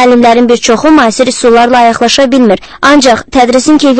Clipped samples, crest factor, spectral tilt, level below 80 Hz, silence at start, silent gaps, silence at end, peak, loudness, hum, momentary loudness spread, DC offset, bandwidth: 5%; 6 dB; -3.5 dB/octave; -36 dBFS; 0 s; none; 0 s; 0 dBFS; -6 LUFS; none; 3 LU; under 0.1%; 11 kHz